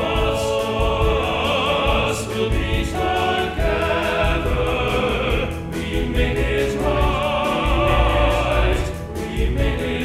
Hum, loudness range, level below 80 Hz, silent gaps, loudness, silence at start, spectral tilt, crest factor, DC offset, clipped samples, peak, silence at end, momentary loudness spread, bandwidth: none; 1 LU; -24 dBFS; none; -20 LUFS; 0 s; -5.5 dB/octave; 14 dB; under 0.1%; under 0.1%; -4 dBFS; 0 s; 5 LU; 15 kHz